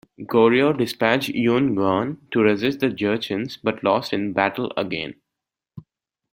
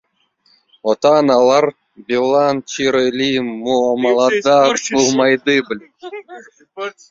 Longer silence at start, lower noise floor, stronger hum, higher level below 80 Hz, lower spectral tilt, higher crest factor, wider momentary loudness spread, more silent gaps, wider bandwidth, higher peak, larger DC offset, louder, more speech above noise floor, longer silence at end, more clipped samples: second, 0.2 s vs 0.85 s; first, -85 dBFS vs -59 dBFS; neither; about the same, -60 dBFS vs -60 dBFS; first, -6 dB/octave vs -3.5 dB/octave; about the same, 20 dB vs 16 dB; second, 8 LU vs 16 LU; neither; first, 16.5 kHz vs 7.8 kHz; about the same, -2 dBFS vs 0 dBFS; neither; second, -21 LUFS vs -15 LUFS; first, 65 dB vs 44 dB; first, 0.5 s vs 0.2 s; neither